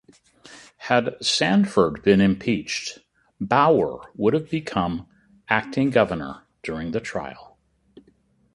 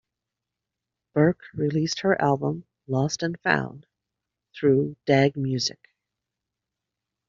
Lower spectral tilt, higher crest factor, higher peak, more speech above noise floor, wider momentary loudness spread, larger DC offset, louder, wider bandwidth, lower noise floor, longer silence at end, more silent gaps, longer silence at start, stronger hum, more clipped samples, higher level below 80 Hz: about the same, -5 dB/octave vs -5 dB/octave; about the same, 22 dB vs 22 dB; about the same, -2 dBFS vs -4 dBFS; second, 40 dB vs 62 dB; first, 15 LU vs 8 LU; neither; about the same, -22 LUFS vs -24 LUFS; first, 11.5 kHz vs 7.6 kHz; second, -61 dBFS vs -86 dBFS; second, 1.1 s vs 1.6 s; neither; second, 0.5 s vs 1.15 s; neither; neither; first, -52 dBFS vs -62 dBFS